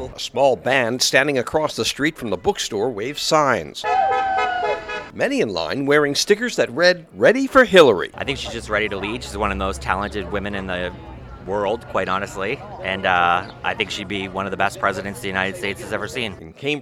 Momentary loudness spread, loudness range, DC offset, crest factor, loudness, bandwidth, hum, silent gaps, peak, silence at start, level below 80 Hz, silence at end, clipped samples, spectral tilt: 10 LU; 8 LU; under 0.1%; 20 dB; -20 LUFS; 16 kHz; none; none; 0 dBFS; 0 s; -42 dBFS; 0 s; under 0.1%; -3.5 dB/octave